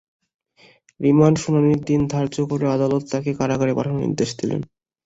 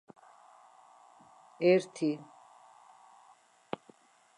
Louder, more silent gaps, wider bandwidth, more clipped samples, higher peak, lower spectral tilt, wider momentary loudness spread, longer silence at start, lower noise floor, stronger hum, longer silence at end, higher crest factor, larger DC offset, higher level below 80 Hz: first, -20 LUFS vs -31 LUFS; neither; second, 8 kHz vs 11 kHz; neither; first, -2 dBFS vs -14 dBFS; about the same, -7 dB/octave vs -6 dB/octave; second, 9 LU vs 18 LU; second, 1 s vs 1.6 s; second, -54 dBFS vs -63 dBFS; neither; second, 0.4 s vs 2.15 s; about the same, 18 dB vs 22 dB; neither; first, -52 dBFS vs -88 dBFS